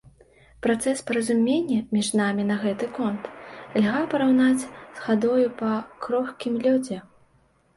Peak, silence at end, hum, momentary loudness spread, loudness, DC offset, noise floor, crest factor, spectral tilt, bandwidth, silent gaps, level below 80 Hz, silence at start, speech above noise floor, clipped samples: -10 dBFS; 0.75 s; none; 11 LU; -24 LUFS; under 0.1%; -62 dBFS; 14 dB; -5 dB/octave; 11.5 kHz; none; -62 dBFS; 0.65 s; 39 dB; under 0.1%